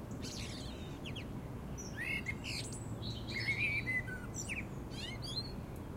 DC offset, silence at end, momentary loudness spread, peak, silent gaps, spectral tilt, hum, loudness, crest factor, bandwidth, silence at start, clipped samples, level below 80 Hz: under 0.1%; 0 s; 11 LU; -24 dBFS; none; -4 dB/octave; none; -40 LUFS; 16 dB; 16 kHz; 0 s; under 0.1%; -52 dBFS